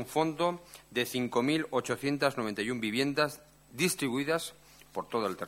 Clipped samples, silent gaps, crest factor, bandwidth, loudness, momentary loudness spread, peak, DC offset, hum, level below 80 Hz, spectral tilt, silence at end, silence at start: under 0.1%; none; 20 dB; 16.5 kHz; -31 LUFS; 12 LU; -12 dBFS; under 0.1%; none; -68 dBFS; -4 dB/octave; 0 s; 0 s